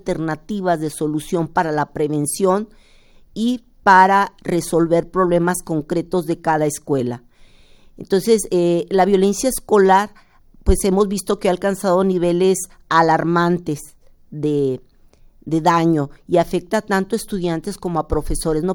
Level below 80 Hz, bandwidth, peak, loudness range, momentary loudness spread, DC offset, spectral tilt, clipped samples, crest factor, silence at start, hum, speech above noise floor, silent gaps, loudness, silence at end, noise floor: -36 dBFS; 18.5 kHz; 0 dBFS; 4 LU; 9 LU; under 0.1%; -5.5 dB/octave; under 0.1%; 18 dB; 0.05 s; none; 31 dB; none; -18 LUFS; 0 s; -49 dBFS